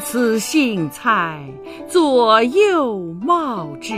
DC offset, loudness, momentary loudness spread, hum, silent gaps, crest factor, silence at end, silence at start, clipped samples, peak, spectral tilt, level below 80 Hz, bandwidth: under 0.1%; -17 LUFS; 13 LU; none; none; 16 dB; 0 s; 0 s; under 0.1%; 0 dBFS; -4.5 dB/octave; -56 dBFS; 15.5 kHz